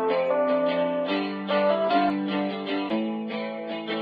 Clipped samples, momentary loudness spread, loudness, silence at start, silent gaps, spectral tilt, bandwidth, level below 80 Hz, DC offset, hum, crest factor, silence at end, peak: under 0.1%; 8 LU; -26 LUFS; 0 s; none; -8 dB/octave; 5.6 kHz; -78 dBFS; under 0.1%; none; 14 dB; 0 s; -10 dBFS